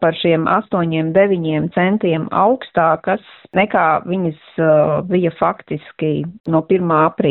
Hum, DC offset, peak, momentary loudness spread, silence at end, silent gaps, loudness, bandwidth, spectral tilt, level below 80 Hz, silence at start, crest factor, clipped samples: none; under 0.1%; -2 dBFS; 7 LU; 0 s; 6.40-6.44 s; -16 LUFS; 4.2 kHz; -10.5 dB/octave; -54 dBFS; 0 s; 14 dB; under 0.1%